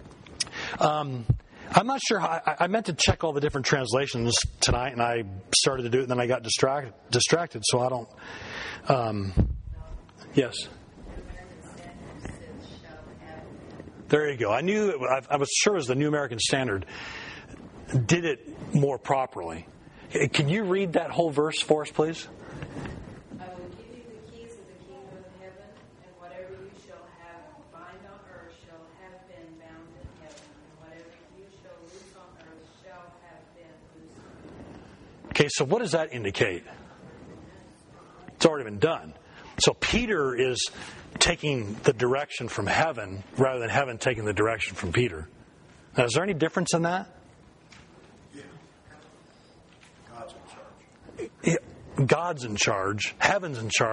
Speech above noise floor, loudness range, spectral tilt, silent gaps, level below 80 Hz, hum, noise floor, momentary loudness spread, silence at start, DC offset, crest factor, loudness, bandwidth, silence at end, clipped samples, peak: 29 dB; 21 LU; -4 dB/octave; none; -48 dBFS; none; -55 dBFS; 23 LU; 0 s; under 0.1%; 26 dB; -26 LUFS; 10.5 kHz; 0 s; under 0.1%; -2 dBFS